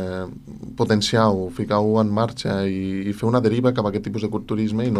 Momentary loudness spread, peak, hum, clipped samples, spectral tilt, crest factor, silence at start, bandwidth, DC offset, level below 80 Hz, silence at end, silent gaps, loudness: 9 LU; -4 dBFS; none; under 0.1%; -6.5 dB/octave; 16 dB; 0 s; 12.5 kHz; under 0.1%; -50 dBFS; 0 s; none; -21 LUFS